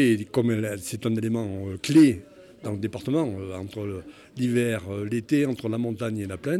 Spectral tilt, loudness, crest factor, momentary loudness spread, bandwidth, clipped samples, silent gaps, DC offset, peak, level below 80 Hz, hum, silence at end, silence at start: -6.5 dB/octave; -26 LUFS; 18 dB; 13 LU; 14.5 kHz; under 0.1%; none; under 0.1%; -8 dBFS; -60 dBFS; none; 0 s; 0 s